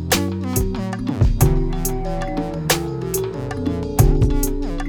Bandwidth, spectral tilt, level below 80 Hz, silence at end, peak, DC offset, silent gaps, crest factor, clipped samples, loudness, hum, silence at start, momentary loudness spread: over 20 kHz; -5 dB/octave; -24 dBFS; 0 s; -2 dBFS; under 0.1%; none; 18 dB; under 0.1%; -21 LUFS; none; 0 s; 8 LU